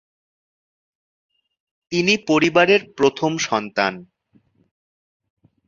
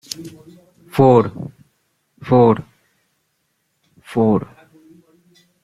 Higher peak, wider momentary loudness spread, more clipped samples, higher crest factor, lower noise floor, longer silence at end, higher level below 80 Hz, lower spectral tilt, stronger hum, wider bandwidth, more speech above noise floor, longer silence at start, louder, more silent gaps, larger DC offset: about the same, -2 dBFS vs -2 dBFS; second, 8 LU vs 24 LU; neither; about the same, 22 dB vs 18 dB; second, -60 dBFS vs -69 dBFS; first, 1.65 s vs 1.2 s; second, -62 dBFS vs -54 dBFS; second, -4 dB/octave vs -7.5 dB/octave; neither; second, 7.6 kHz vs 14.5 kHz; second, 41 dB vs 54 dB; first, 1.9 s vs 0.2 s; about the same, -18 LUFS vs -16 LUFS; neither; neither